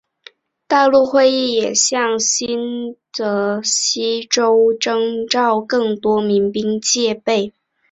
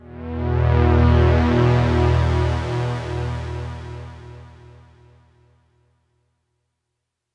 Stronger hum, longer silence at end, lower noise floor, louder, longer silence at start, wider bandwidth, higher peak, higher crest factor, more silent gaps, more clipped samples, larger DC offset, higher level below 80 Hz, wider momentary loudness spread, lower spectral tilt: neither; second, 0.45 s vs 2.9 s; second, -46 dBFS vs -79 dBFS; first, -16 LUFS vs -19 LUFS; first, 0.7 s vs 0.05 s; about the same, 8.4 kHz vs 7.8 kHz; about the same, -2 dBFS vs -4 dBFS; about the same, 16 dB vs 16 dB; neither; neither; neither; second, -60 dBFS vs -30 dBFS; second, 8 LU vs 19 LU; second, -2.5 dB/octave vs -8 dB/octave